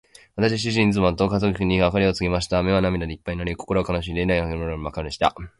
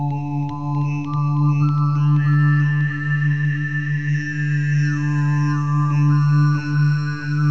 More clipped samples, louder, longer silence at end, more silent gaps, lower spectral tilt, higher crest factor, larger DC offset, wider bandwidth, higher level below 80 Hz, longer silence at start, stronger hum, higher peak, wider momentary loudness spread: neither; second, -22 LUFS vs -19 LUFS; about the same, 0.1 s vs 0 s; neither; second, -6 dB/octave vs -8 dB/octave; first, 18 dB vs 10 dB; second, under 0.1% vs 1%; first, 11.5 kHz vs 6.4 kHz; first, -36 dBFS vs -58 dBFS; first, 0.35 s vs 0 s; second, none vs 50 Hz at -35 dBFS; first, -4 dBFS vs -8 dBFS; first, 9 LU vs 6 LU